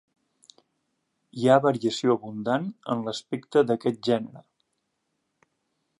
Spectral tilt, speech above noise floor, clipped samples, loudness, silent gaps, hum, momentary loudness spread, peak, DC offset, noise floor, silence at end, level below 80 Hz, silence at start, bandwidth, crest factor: -6 dB/octave; 53 dB; under 0.1%; -25 LUFS; none; none; 11 LU; -6 dBFS; under 0.1%; -78 dBFS; 1.6 s; -76 dBFS; 1.35 s; 11.5 kHz; 22 dB